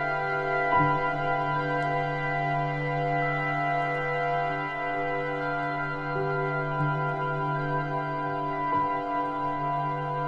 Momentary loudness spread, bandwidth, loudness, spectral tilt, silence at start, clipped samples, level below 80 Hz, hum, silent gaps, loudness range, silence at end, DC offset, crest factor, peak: 3 LU; 7.4 kHz; -28 LUFS; -8 dB/octave; 0 s; under 0.1%; -52 dBFS; none; none; 2 LU; 0 s; under 0.1%; 16 dB; -12 dBFS